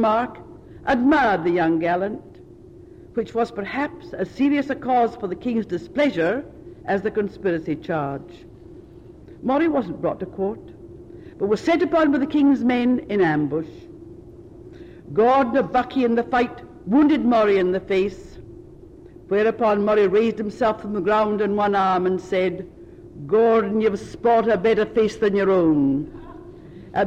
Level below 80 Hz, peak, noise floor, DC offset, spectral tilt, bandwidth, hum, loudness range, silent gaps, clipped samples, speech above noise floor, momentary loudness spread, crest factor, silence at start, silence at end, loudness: -50 dBFS; -10 dBFS; -44 dBFS; under 0.1%; -7 dB/octave; 8.6 kHz; none; 6 LU; none; under 0.1%; 24 dB; 19 LU; 12 dB; 0 s; 0 s; -21 LUFS